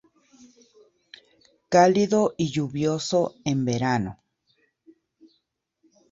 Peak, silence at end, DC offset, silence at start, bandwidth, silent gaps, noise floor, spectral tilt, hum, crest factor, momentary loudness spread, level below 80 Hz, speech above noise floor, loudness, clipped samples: -4 dBFS; 2 s; under 0.1%; 1.7 s; 8 kHz; none; -74 dBFS; -5.5 dB/octave; none; 22 dB; 8 LU; -60 dBFS; 52 dB; -23 LUFS; under 0.1%